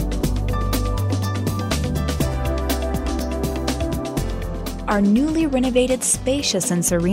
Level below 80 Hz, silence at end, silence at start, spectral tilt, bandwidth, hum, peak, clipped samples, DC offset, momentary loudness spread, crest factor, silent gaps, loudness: -28 dBFS; 0 s; 0 s; -5 dB/octave; 16.5 kHz; none; -6 dBFS; under 0.1%; under 0.1%; 7 LU; 16 dB; none; -21 LUFS